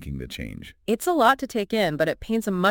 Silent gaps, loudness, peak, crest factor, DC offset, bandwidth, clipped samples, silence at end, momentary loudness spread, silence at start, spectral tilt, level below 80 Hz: none; -23 LUFS; -6 dBFS; 18 dB; under 0.1%; 17 kHz; under 0.1%; 0 s; 15 LU; 0 s; -5 dB/octave; -46 dBFS